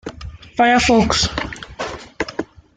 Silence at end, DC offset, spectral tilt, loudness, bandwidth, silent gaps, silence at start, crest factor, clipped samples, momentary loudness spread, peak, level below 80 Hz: 0.3 s; under 0.1%; -3.5 dB/octave; -17 LUFS; 9.6 kHz; none; 0.05 s; 18 dB; under 0.1%; 16 LU; -2 dBFS; -36 dBFS